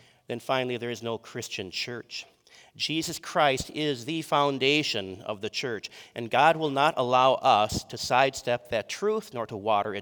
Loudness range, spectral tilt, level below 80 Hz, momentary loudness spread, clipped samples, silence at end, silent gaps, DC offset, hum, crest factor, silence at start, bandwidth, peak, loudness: 6 LU; -4 dB/octave; -58 dBFS; 13 LU; under 0.1%; 0 s; none; under 0.1%; none; 22 dB; 0.3 s; over 20 kHz; -6 dBFS; -27 LUFS